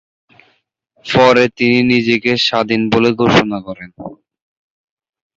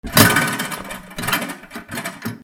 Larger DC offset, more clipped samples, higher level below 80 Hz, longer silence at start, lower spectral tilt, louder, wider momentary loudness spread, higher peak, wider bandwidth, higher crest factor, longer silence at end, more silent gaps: neither; neither; about the same, -48 dBFS vs -44 dBFS; first, 1.05 s vs 0.05 s; first, -5.5 dB/octave vs -3 dB/octave; first, -12 LUFS vs -19 LUFS; first, 21 LU vs 18 LU; about the same, 0 dBFS vs 0 dBFS; second, 7.8 kHz vs over 20 kHz; about the same, 16 dB vs 20 dB; first, 1.25 s vs 0.05 s; neither